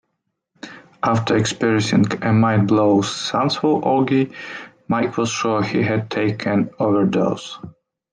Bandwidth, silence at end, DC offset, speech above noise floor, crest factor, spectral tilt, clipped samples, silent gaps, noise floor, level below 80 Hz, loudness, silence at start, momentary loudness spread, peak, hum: 10 kHz; 0.45 s; under 0.1%; 57 dB; 14 dB; -6 dB/octave; under 0.1%; none; -75 dBFS; -58 dBFS; -19 LUFS; 0.65 s; 17 LU; -4 dBFS; none